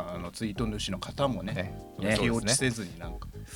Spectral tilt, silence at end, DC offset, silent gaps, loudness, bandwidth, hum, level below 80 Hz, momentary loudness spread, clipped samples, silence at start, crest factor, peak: -4 dB/octave; 0 s; under 0.1%; none; -30 LUFS; 19 kHz; none; -46 dBFS; 13 LU; under 0.1%; 0 s; 20 dB; -12 dBFS